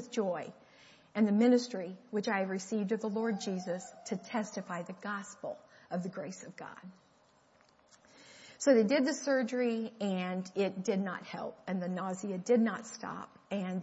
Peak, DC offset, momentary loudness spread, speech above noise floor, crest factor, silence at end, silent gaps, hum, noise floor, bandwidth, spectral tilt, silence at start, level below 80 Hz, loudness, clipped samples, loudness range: -14 dBFS; under 0.1%; 16 LU; 33 dB; 20 dB; 0 s; none; none; -67 dBFS; 8 kHz; -5.5 dB/octave; 0 s; -82 dBFS; -34 LUFS; under 0.1%; 11 LU